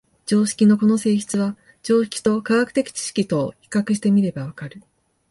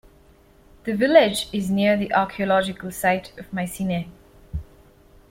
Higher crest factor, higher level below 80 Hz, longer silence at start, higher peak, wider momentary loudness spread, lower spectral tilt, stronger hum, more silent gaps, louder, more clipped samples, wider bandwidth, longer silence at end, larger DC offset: second, 14 dB vs 20 dB; second, -60 dBFS vs -46 dBFS; second, 0.25 s vs 0.85 s; second, -6 dBFS vs -2 dBFS; second, 12 LU vs 19 LU; about the same, -5.5 dB/octave vs -5 dB/octave; neither; neither; about the same, -20 LUFS vs -22 LUFS; neither; second, 11.5 kHz vs 16.5 kHz; second, 0.5 s vs 0.65 s; neither